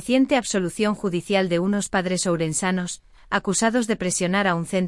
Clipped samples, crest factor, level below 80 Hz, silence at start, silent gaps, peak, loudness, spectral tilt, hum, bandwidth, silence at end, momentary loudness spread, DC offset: under 0.1%; 16 dB; -52 dBFS; 0 s; none; -6 dBFS; -22 LUFS; -4.5 dB/octave; none; 12 kHz; 0 s; 5 LU; under 0.1%